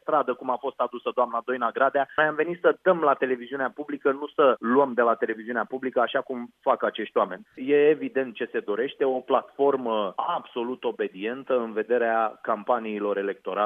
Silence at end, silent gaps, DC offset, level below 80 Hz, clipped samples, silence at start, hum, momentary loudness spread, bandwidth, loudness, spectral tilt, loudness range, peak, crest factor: 0 s; none; under 0.1%; -80 dBFS; under 0.1%; 0.05 s; none; 8 LU; 3.8 kHz; -25 LUFS; -7.5 dB/octave; 3 LU; -6 dBFS; 18 dB